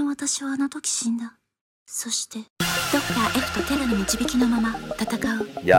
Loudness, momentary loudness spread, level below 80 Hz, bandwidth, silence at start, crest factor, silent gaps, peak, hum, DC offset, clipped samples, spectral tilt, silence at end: -24 LUFS; 7 LU; -46 dBFS; 17 kHz; 0 s; 20 dB; 1.61-1.86 s, 2.50-2.56 s; -4 dBFS; none; under 0.1%; under 0.1%; -3 dB/octave; 0 s